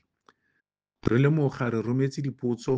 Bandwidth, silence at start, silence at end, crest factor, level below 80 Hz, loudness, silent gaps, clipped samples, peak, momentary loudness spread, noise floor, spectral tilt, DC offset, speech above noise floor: 7.8 kHz; 1.05 s; 0 s; 18 dB; -54 dBFS; -26 LUFS; none; under 0.1%; -8 dBFS; 8 LU; -78 dBFS; -8 dB/octave; under 0.1%; 53 dB